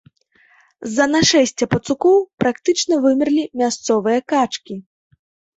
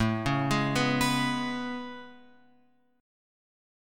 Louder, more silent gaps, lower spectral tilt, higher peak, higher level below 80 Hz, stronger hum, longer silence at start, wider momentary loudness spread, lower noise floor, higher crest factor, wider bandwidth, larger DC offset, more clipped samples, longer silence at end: first, -17 LUFS vs -28 LUFS; first, 2.34-2.38 s vs none; about the same, -4 dB/octave vs -5 dB/octave; first, -2 dBFS vs -12 dBFS; about the same, -54 dBFS vs -52 dBFS; neither; first, 0.8 s vs 0 s; second, 10 LU vs 14 LU; second, -56 dBFS vs -66 dBFS; about the same, 16 dB vs 20 dB; second, 8.2 kHz vs 17.5 kHz; neither; neither; second, 0.75 s vs 1 s